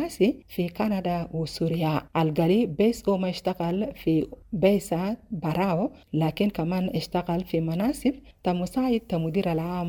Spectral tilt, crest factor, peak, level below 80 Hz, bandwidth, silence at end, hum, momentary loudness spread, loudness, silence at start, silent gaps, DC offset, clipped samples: -7 dB/octave; 18 dB; -8 dBFS; -50 dBFS; 19 kHz; 0 s; none; 6 LU; -26 LUFS; 0 s; none; under 0.1%; under 0.1%